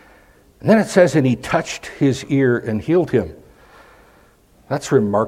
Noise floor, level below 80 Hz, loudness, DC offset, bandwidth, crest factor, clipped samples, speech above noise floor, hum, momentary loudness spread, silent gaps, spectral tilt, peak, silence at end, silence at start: -52 dBFS; -50 dBFS; -18 LUFS; under 0.1%; 15.5 kHz; 18 dB; under 0.1%; 35 dB; none; 11 LU; none; -6.5 dB/octave; 0 dBFS; 0 s; 0.65 s